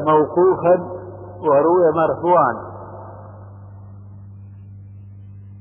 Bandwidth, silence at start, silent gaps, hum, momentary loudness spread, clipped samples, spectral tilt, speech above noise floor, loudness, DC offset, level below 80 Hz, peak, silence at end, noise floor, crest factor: 3.5 kHz; 0 s; none; 50 Hz at -40 dBFS; 25 LU; under 0.1%; -11.5 dB/octave; 23 dB; -16 LUFS; under 0.1%; -52 dBFS; -4 dBFS; 0 s; -38 dBFS; 16 dB